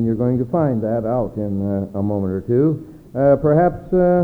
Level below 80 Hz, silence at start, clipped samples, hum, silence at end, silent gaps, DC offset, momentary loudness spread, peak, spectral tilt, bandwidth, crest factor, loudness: -42 dBFS; 0 s; under 0.1%; none; 0 s; none; under 0.1%; 7 LU; -4 dBFS; -12 dB/octave; 4.5 kHz; 14 dB; -19 LUFS